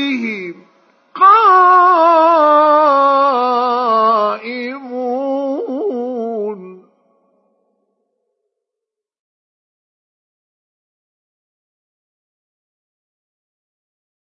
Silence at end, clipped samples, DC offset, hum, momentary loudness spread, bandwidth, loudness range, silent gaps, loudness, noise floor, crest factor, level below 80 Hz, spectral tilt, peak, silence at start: 7.6 s; under 0.1%; under 0.1%; none; 16 LU; 6.4 kHz; 16 LU; none; -12 LUFS; -83 dBFS; 16 dB; -86 dBFS; -5.5 dB/octave; 0 dBFS; 0 s